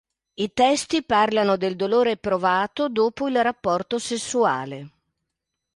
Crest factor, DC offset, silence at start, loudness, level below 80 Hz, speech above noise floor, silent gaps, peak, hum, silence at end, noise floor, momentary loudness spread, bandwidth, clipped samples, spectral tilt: 16 dB; under 0.1%; 0.4 s; -22 LUFS; -60 dBFS; 60 dB; none; -6 dBFS; none; 0.85 s; -82 dBFS; 7 LU; 11.5 kHz; under 0.1%; -4 dB/octave